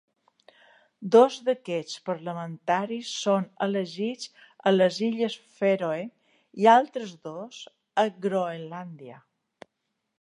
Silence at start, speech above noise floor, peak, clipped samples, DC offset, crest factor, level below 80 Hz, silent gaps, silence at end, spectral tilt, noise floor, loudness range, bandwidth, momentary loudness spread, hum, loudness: 1 s; 55 dB; -4 dBFS; under 0.1%; under 0.1%; 22 dB; -82 dBFS; none; 1.05 s; -5 dB/octave; -80 dBFS; 4 LU; 10.5 kHz; 20 LU; none; -25 LUFS